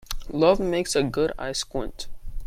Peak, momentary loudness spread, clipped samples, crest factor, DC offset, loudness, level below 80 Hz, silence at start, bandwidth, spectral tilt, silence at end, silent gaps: -6 dBFS; 16 LU; under 0.1%; 18 dB; under 0.1%; -24 LUFS; -38 dBFS; 0.05 s; 16 kHz; -4.5 dB/octave; 0 s; none